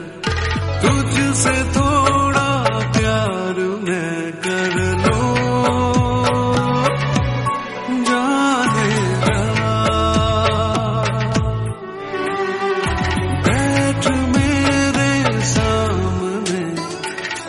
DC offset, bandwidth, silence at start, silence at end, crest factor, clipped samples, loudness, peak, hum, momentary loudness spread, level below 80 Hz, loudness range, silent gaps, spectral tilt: under 0.1%; 11.5 kHz; 0 s; 0 s; 16 dB; under 0.1%; -18 LUFS; -2 dBFS; none; 7 LU; -32 dBFS; 2 LU; none; -5 dB/octave